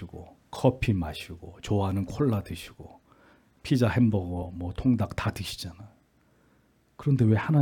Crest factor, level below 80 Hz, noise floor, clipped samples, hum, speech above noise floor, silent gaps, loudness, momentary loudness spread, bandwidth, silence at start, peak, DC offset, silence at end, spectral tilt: 20 dB; -50 dBFS; -65 dBFS; under 0.1%; none; 39 dB; none; -27 LUFS; 19 LU; 18 kHz; 0 s; -8 dBFS; under 0.1%; 0 s; -7.5 dB/octave